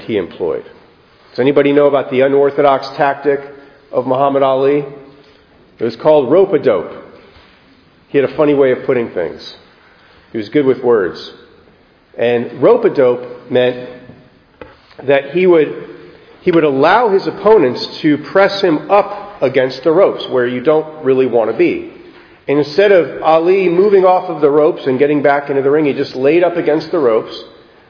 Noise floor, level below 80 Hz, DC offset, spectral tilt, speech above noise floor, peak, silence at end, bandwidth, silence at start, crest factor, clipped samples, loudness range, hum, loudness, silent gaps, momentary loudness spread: -48 dBFS; -56 dBFS; under 0.1%; -7.5 dB/octave; 36 dB; 0 dBFS; 0.45 s; 5.4 kHz; 0 s; 14 dB; under 0.1%; 5 LU; none; -13 LUFS; none; 11 LU